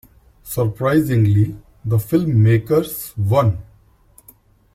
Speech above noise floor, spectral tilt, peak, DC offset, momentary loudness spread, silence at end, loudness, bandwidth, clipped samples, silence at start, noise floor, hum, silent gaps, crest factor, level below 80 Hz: 35 dB; -7.5 dB/octave; -4 dBFS; under 0.1%; 11 LU; 1.15 s; -18 LUFS; 16 kHz; under 0.1%; 0.45 s; -52 dBFS; none; none; 14 dB; -46 dBFS